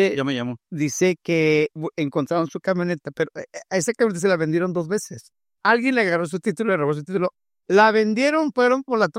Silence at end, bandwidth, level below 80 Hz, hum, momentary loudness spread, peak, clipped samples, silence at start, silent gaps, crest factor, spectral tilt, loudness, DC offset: 0 s; 15.5 kHz; -68 dBFS; none; 9 LU; -4 dBFS; under 0.1%; 0 s; none; 18 dB; -5 dB/octave; -21 LUFS; under 0.1%